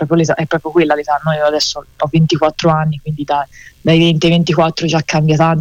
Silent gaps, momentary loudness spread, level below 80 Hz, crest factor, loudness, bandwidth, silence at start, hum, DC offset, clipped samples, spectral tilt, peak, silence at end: none; 7 LU; -44 dBFS; 12 dB; -14 LUFS; 8 kHz; 0 s; none; under 0.1%; under 0.1%; -6 dB/octave; -2 dBFS; 0 s